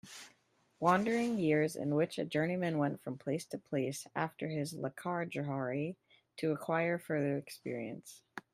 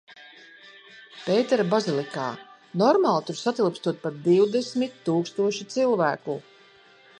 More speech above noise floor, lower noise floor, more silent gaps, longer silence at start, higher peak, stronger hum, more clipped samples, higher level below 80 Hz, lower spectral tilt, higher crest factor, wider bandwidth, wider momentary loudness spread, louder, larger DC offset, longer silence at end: first, 37 dB vs 30 dB; first, -72 dBFS vs -54 dBFS; neither; about the same, 0.05 s vs 0.1 s; second, -14 dBFS vs -6 dBFS; neither; neither; about the same, -76 dBFS vs -78 dBFS; about the same, -6 dB/octave vs -5.5 dB/octave; about the same, 22 dB vs 20 dB; first, 15.5 kHz vs 10.5 kHz; about the same, 12 LU vs 13 LU; second, -36 LUFS vs -24 LUFS; neither; second, 0.15 s vs 0.8 s